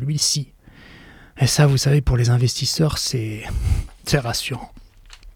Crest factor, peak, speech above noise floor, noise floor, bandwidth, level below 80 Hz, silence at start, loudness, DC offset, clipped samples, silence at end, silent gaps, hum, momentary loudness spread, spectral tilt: 18 dB; -2 dBFS; 26 dB; -45 dBFS; 18 kHz; -32 dBFS; 0 s; -20 LUFS; under 0.1%; under 0.1%; 0.05 s; none; none; 11 LU; -4.5 dB/octave